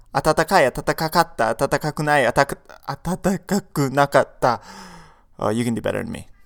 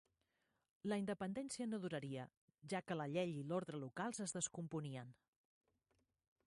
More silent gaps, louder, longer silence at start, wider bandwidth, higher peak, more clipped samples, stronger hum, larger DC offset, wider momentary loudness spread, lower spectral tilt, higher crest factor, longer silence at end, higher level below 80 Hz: second, none vs 2.37-2.48 s; first, -20 LUFS vs -46 LUFS; second, 0.15 s vs 0.85 s; first, 19 kHz vs 11.5 kHz; first, 0 dBFS vs -28 dBFS; neither; neither; neither; first, 12 LU vs 9 LU; about the same, -5 dB/octave vs -5 dB/octave; about the same, 20 dB vs 18 dB; second, 0.2 s vs 1.35 s; first, -44 dBFS vs -82 dBFS